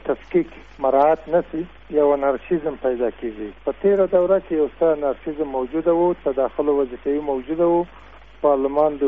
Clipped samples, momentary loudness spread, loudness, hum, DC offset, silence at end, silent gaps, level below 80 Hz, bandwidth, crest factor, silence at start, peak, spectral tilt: under 0.1%; 9 LU; -21 LUFS; none; 0.4%; 0 s; none; -48 dBFS; 3.9 kHz; 14 dB; 0.05 s; -6 dBFS; -6.5 dB/octave